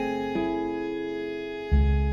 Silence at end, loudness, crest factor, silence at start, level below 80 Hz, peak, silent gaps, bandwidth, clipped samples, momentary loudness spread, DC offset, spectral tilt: 0 s; -28 LUFS; 16 dB; 0 s; -30 dBFS; -12 dBFS; none; 6.6 kHz; under 0.1%; 9 LU; under 0.1%; -8.5 dB/octave